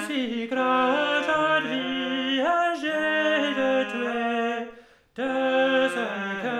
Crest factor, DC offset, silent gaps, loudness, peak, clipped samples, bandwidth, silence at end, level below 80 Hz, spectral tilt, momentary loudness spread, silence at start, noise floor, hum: 14 dB; under 0.1%; none; -24 LUFS; -10 dBFS; under 0.1%; 13 kHz; 0 s; -68 dBFS; -4 dB/octave; 7 LU; 0 s; -49 dBFS; none